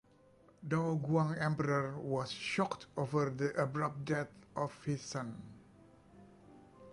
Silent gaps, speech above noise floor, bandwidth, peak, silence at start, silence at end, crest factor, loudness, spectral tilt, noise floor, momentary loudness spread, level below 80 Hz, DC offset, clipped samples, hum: none; 29 dB; 11.5 kHz; -20 dBFS; 0.6 s; 0 s; 18 dB; -37 LUFS; -6.5 dB/octave; -65 dBFS; 9 LU; -70 dBFS; under 0.1%; under 0.1%; none